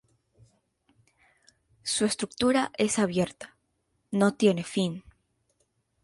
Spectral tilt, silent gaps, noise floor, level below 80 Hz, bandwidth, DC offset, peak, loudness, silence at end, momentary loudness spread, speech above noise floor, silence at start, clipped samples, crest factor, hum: -4.5 dB/octave; none; -75 dBFS; -62 dBFS; 11.5 kHz; under 0.1%; -10 dBFS; -27 LUFS; 1.05 s; 13 LU; 49 dB; 1.85 s; under 0.1%; 20 dB; none